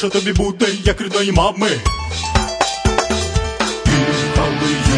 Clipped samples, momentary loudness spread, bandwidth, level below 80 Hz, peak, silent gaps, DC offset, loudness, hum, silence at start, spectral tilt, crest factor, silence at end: under 0.1%; 4 LU; 11 kHz; -24 dBFS; 0 dBFS; none; under 0.1%; -17 LUFS; none; 0 s; -4.5 dB/octave; 16 dB; 0 s